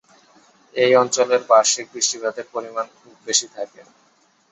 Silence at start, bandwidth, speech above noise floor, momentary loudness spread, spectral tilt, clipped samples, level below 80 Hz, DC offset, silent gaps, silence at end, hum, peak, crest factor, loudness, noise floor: 0.75 s; 8.4 kHz; 34 dB; 17 LU; -1 dB/octave; under 0.1%; -74 dBFS; under 0.1%; none; 0.7 s; none; -2 dBFS; 20 dB; -19 LUFS; -54 dBFS